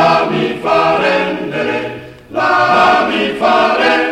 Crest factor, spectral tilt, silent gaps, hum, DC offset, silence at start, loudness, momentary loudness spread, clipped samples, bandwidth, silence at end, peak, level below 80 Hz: 12 dB; -5 dB/octave; none; none; under 0.1%; 0 s; -12 LUFS; 9 LU; under 0.1%; 13.5 kHz; 0 s; 0 dBFS; -48 dBFS